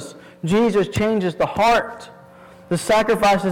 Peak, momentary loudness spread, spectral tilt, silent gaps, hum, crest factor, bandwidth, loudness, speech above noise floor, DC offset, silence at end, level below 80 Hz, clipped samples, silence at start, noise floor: -10 dBFS; 15 LU; -5.5 dB/octave; none; none; 8 dB; 18 kHz; -19 LUFS; 26 dB; under 0.1%; 0 s; -46 dBFS; under 0.1%; 0 s; -44 dBFS